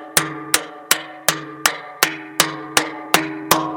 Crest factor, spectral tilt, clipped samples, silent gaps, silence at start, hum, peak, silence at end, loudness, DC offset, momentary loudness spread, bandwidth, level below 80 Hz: 22 dB; -1 dB/octave; under 0.1%; none; 0 s; none; 0 dBFS; 0 s; -19 LUFS; under 0.1%; 2 LU; over 20 kHz; -54 dBFS